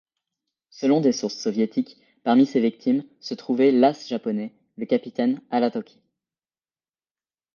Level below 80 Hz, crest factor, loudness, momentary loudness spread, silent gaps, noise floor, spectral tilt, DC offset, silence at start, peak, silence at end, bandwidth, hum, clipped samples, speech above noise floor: -76 dBFS; 20 dB; -23 LUFS; 14 LU; none; under -90 dBFS; -6 dB/octave; under 0.1%; 0.75 s; -4 dBFS; 1.7 s; 7 kHz; none; under 0.1%; over 68 dB